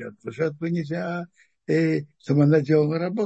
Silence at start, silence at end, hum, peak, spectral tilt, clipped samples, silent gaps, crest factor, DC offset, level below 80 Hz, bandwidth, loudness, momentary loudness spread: 0 s; 0 s; none; -8 dBFS; -9 dB/octave; under 0.1%; none; 16 dB; under 0.1%; -68 dBFS; 8 kHz; -23 LUFS; 15 LU